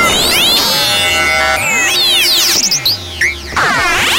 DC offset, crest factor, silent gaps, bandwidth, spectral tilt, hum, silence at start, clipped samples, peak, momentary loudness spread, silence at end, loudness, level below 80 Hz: under 0.1%; 10 dB; none; 16.5 kHz; -0.5 dB/octave; none; 0 s; under 0.1%; -2 dBFS; 6 LU; 0 s; -9 LUFS; -34 dBFS